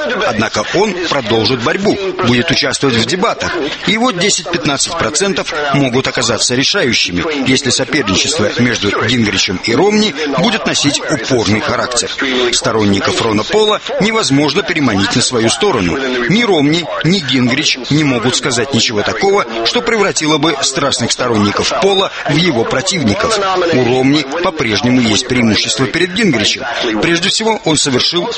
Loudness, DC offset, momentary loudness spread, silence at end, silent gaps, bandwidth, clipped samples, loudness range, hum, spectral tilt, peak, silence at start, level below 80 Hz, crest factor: -12 LUFS; under 0.1%; 3 LU; 0 s; none; 8.8 kHz; under 0.1%; 1 LU; none; -3.5 dB/octave; 0 dBFS; 0 s; -42 dBFS; 12 dB